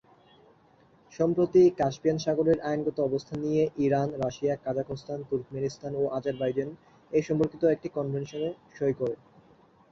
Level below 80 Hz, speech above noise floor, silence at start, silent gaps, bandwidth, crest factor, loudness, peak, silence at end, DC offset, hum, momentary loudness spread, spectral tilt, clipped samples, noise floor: -62 dBFS; 33 dB; 1.1 s; none; 7.4 kHz; 18 dB; -28 LUFS; -12 dBFS; 0.75 s; under 0.1%; none; 10 LU; -7.5 dB/octave; under 0.1%; -60 dBFS